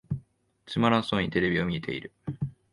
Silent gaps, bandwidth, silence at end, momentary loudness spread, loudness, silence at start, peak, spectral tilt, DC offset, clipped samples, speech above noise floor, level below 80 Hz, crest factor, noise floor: none; 11 kHz; 0.2 s; 13 LU; -28 LUFS; 0.1 s; -8 dBFS; -7 dB/octave; under 0.1%; under 0.1%; 28 dB; -52 dBFS; 20 dB; -55 dBFS